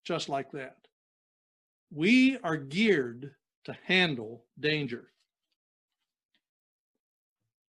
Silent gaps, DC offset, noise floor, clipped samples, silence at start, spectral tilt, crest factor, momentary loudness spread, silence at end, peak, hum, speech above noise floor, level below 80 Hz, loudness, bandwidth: 0.92-1.87 s, 3.56-3.62 s; under 0.1%; under -90 dBFS; under 0.1%; 0.05 s; -5.5 dB/octave; 22 dB; 23 LU; 2.65 s; -10 dBFS; none; over 61 dB; -76 dBFS; -28 LUFS; 10.5 kHz